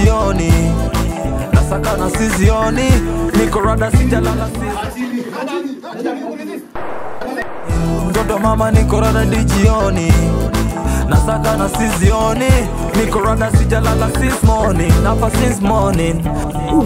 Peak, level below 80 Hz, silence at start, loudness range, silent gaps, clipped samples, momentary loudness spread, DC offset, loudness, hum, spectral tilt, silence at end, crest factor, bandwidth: 0 dBFS; -20 dBFS; 0 s; 6 LU; none; under 0.1%; 9 LU; under 0.1%; -15 LUFS; none; -6 dB/octave; 0 s; 14 dB; 16.5 kHz